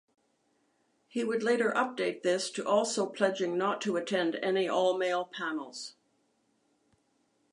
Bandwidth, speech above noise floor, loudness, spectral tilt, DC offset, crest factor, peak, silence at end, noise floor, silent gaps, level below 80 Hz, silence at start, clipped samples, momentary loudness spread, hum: 11 kHz; 43 dB; -30 LUFS; -3.5 dB/octave; under 0.1%; 20 dB; -12 dBFS; 1.6 s; -73 dBFS; none; -86 dBFS; 1.15 s; under 0.1%; 8 LU; none